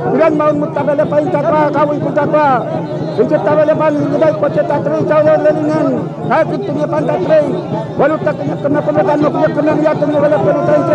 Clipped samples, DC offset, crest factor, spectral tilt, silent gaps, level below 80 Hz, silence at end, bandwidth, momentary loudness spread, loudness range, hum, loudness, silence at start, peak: under 0.1%; under 0.1%; 12 dB; -8.5 dB/octave; none; -50 dBFS; 0 s; 8.4 kHz; 5 LU; 2 LU; none; -13 LUFS; 0 s; 0 dBFS